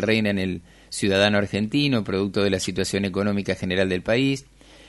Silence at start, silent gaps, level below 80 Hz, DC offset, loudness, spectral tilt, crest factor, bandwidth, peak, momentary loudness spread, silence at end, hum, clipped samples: 0 s; none; -52 dBFS; under 0.1%; -23 LUFS; -5 dB/octave; 18 dB; 11.5 kHz; -4 dBFS; 7 LU; 0.45 s; none; under 0.1%